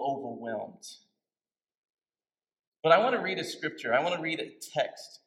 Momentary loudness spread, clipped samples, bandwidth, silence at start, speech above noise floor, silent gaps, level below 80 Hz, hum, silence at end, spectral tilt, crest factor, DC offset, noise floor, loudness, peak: 15 LU; under 0.1%; 16.5 kHz; 0 s; over 61 dB; 1.77-1.83 s, 2.67-2.72 s; -86 dBFS; none; 0.1 s; -4 dB/octave; 24 dB; under 0.1%; under -90 dBFS; -29 LUFS; -6 dBFS